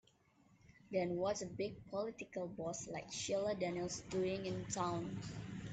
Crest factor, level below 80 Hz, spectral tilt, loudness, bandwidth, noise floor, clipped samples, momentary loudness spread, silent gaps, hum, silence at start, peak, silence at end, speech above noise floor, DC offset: 16 dB; -68 dBFS; -4.5 dB/octave; -42 LUFS; 9 kHz; -71 dBFS; under 0.1%; 7 LU; none; none; 0.65 s; -26 dBFS; 0 s; 30 dB; under 0.1%